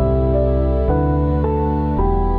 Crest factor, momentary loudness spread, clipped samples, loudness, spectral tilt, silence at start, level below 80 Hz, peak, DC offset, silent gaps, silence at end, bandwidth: 10 dB; 2 LU; under 0.1%; -18 LUFS; -12 dB/octave; 0 s; -20 dBFS; -6 dBFS; under 0.1%; none; 0 s; 4.2 kHz